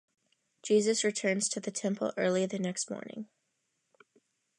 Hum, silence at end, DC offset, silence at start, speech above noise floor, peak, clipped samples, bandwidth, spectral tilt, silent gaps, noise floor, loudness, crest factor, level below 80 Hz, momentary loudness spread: none; 1.35 s; under 0.1%; 0.65 s; 49 dB; -16 dBFS; under 0.1%; 11 kHz; -3.5 dB/octave; none; -80 dBFS; -31 LUFS; 18 dB; -84 dBFS; 17 LU